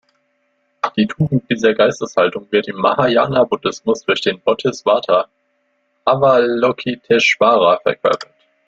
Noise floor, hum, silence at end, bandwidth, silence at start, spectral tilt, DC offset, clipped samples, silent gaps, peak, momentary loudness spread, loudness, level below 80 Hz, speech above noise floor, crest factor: -65 dBFS; none; 0.45 s; 8 kHz; 0.85 s; -5.5 dB/octave; under 0.1%; under 0.1%; none; 0 dBFS; 7 LU; -16 LUFS; -56 dBFS; 50 dB; 16 dB